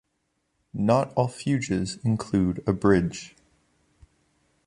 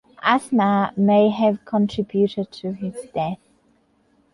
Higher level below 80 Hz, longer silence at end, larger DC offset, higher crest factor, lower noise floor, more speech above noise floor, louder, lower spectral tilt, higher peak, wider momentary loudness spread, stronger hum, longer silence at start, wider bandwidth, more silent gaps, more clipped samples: first, -48 dBFS vs -58 dBFS; first, 1.4 s vs 1 s; neither; about the same, 20 dB vs 18 dB; first, -75 dBFS vs -61 dBFS; first, 51 dB vs 42 dB; second, -25 LUFS vs -21 LUFS; about the same, -7 dB/octave vs -7 dB/octave; about the same, -6 dBFS vs -4 dBFS; about the same, 12 LU vs 12 LU; neither; first, 0.75 s vs 0.25 s; about the same, 11.5 kHz vs 11.5 kHz; neither; neither